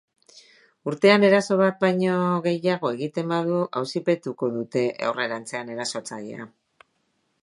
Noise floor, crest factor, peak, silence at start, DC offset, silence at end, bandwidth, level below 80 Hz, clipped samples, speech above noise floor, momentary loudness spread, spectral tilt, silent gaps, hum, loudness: -71 dBFS; 20 dB; -4 dBFS; 0.85 s; under 0.1%; 0.95 s; 11.5 kHz; -74 dBFS; under 0.1%; 48 dB; 15 LU; -5.5 dB/octave; none; none; -23 LUFS